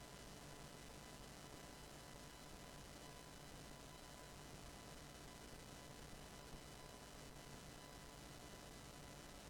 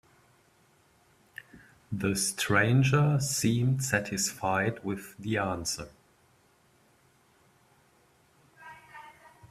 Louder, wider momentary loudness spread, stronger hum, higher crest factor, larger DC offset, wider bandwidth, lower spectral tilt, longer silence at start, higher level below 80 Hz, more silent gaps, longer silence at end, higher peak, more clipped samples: second, -57 LUFS vs -28 LUFS; second, 1 LU vs 25 LU; first, 50 Hz at -65 dBFS vs none; about the same, 18 dB vs 22 dB; neither; first, 19 kHz vs 15.5 kHz; about the same, -3.5 dB/octave vs -4.5 dB/octave; second, 0 s vs 1.55 s; second, -66 dBFS vs -60 dBFS; neither; about the same, 0 s vs 0.05 s; second, -38 dBFS vs -10 dBFS; neither